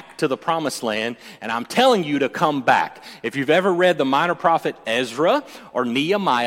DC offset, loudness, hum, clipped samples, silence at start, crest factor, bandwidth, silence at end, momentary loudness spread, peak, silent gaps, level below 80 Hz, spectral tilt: under 0.1%; -20 LUFS; none; under 0.1%; 0.1 s; 18 dB; 16.5 kHz; 0 s; 10 LU; -2 dBFS; none; -66 dBFS; -4.5 dB/octave